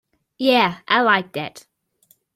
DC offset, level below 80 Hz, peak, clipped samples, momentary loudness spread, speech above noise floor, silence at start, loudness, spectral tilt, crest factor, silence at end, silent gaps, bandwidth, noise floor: under 0.1%; -68 dBFS; -2 dBFS; under 0.1%; 14 LU; 42 dB; 0.4 s; -18 LUFS; -5 dB/octave; 20 dB; 0.75 s; none; 15.5 kHz; -60 dBFS